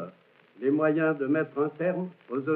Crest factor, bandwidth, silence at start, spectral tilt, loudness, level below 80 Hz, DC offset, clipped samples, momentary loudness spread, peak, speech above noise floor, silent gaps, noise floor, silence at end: 16 dB; 4 kHz; 0 s; -7.5 dB/octave; -28 LUFS; under -90 dBFS; under 0.1%; under 0.1%; 10 LU; -12 dBFS; 30 dB; none; -57 dBFS; 0 s